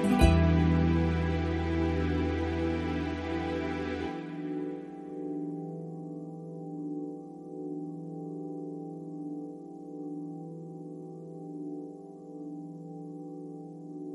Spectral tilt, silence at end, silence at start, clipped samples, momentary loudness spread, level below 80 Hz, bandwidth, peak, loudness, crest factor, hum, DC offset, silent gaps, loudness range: -7.5 dB/octave; 0 s; 0 s; under 0.1%; 17 LU; -42 dBFS; 12.5 kHz; -8 dBFS; -33 LUFS; 24 dB; none; under 0.1%; none; 13 LU